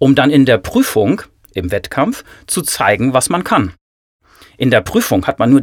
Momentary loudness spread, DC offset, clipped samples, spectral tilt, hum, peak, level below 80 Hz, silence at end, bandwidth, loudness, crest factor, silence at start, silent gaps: 10 LU; under 0.1%; under 0.1%; -5 dB/octave; none; 0 dBFS; -42 dBFS; 0 s; 18.5 kHz; -14 LUFS; 14 dB; 0 s; 3.81-4.20 s